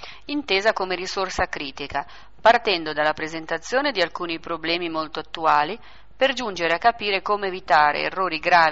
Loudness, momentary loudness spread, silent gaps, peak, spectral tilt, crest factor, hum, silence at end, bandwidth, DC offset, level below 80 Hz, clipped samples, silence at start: -22 LUFS; 11 LU; none; -6 dBFS; -0.5 dB/octave; 18 dB; none; 0 s; 8 kHz; 0.8%; -50 dBFS; under 0.1%; 0 s